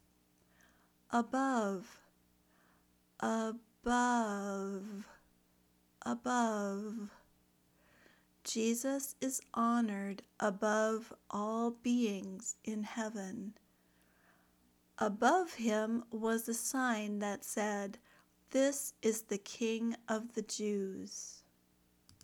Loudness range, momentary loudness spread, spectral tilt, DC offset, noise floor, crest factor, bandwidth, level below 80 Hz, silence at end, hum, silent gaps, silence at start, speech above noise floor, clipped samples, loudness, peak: 5 LU; 12 LU; -4 dB/octave; under 0.1%; -72 dBFS; 22 dB; 19 kHz; -72 dBFS; 0.85 s; 60 Hz at -65 dBFS; none; 1.1 s; 36 dB; under 0.1%; -37 LUFS; -16 dBFS